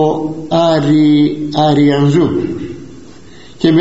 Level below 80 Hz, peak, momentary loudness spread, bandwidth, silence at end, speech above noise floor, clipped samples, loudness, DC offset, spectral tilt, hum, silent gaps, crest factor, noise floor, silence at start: -46 dBFS; 0 dBFS; 11 LU; 8 kHz; 0 s; 27 dB; under 0.1%; -12 LUFS; 1%; -6.5 dB/octave; none; none; 12 dB; -38 dBFS; 0 s